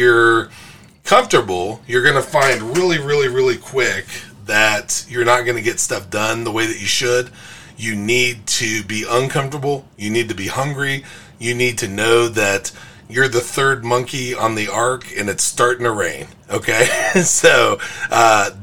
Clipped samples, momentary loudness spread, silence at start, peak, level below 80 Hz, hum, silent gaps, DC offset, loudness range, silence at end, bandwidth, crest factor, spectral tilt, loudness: under 0.1%; 10 LU; 0 s; 0 dBFS; -50 dBFS; none; none; 1%; 4 LU; 0 s; 18.5 kHz; 18 dB; -3 dB/octave; -16 LUFS